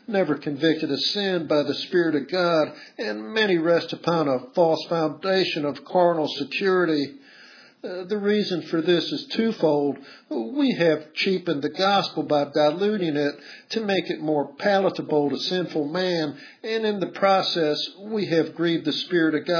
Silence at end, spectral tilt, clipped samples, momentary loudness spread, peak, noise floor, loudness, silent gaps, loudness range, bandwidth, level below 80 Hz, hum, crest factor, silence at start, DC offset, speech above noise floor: 0 s; -6 dB/octave; under 0.1%; 8 LU; -6 dBFS; -49 dBFS; -23 LUFS; none; 2 LU; 5.4 kHz; -80 dBFS; none; 16 dB; 0.1 s; under 0.1%; 26 dB